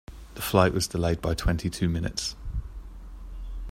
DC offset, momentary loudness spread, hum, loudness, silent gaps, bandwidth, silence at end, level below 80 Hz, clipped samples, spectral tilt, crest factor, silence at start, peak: under 0.1%; 22 LU; none; -27 LUFS; none; 16 kHz; 0 s; -38 dBFS; under 0.1%; -5 dB/octave; 24 dB; 0.1 s; -4 dBFS